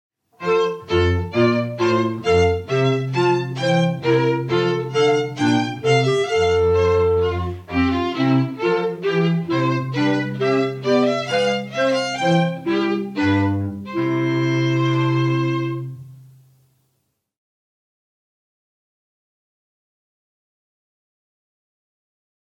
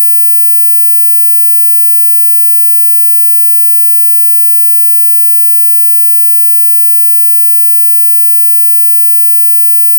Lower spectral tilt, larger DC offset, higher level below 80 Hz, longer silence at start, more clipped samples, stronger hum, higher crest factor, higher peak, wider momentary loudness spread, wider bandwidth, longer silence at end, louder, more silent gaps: first, -6.5 dB/octave vs 0 dB/octave; neither; first, -46 dBFS vs under -90 dBFS; first, 0.4 s vs 0 s; neither; neither; first, 16 dB vs 4 dB; about the same, -4 dBFS vs -2 dBFS; first, 4 LU vs 0 LU; second, 9.8 kHz vs 18.5 kHz; first, 6.2 s vs 0 s; second, -19 LUFS vs -2 LUFS; neither